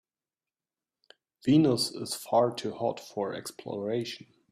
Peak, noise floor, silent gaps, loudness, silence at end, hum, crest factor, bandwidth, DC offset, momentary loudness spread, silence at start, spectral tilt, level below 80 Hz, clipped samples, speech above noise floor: -12 dBFS; under -90 dBFS; none; -29 LUFS; 0.3 s; none; 18 dB; 15.5 kHz; under 0.1%; 15 LU; 1.45 s; -5.5 dB/octave; -68 dBFS; under 0.1%; over 61 dB